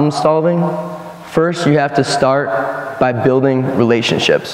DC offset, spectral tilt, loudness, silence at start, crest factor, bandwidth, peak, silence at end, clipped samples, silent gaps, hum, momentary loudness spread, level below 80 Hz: under 0.1%; -5.5 dB/octave; -14 LUFS; 0 s; 14 dB; 15 kHz; 0 dBFS; 0 s; under 0.1%; none; none; 7 LU; -52 dBFS